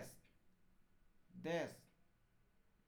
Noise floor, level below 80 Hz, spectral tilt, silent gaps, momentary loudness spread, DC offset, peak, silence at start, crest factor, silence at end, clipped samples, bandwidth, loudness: -75 dBFS; -78 dBFS; -5 dB/octave; none; 21 LU; under 0.1%; -32 dBFS; 0 s; 20 dB; 1.05 s; under 0.1%; over 20 kHz; -46 LUFS